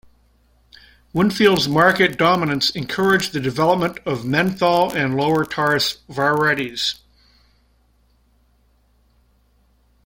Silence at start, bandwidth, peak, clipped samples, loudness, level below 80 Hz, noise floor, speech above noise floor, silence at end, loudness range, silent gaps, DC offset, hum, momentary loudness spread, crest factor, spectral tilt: 1.15 s; 16.5 kHz; -2 dBFS; under 0.1%; -18 LUFS; -52 dBFS; -59 dBFS; 41 dB; 3.1 s; 7 LU; none; under 0.1%; none; 8 LU; 20 dB; -5 dB/octave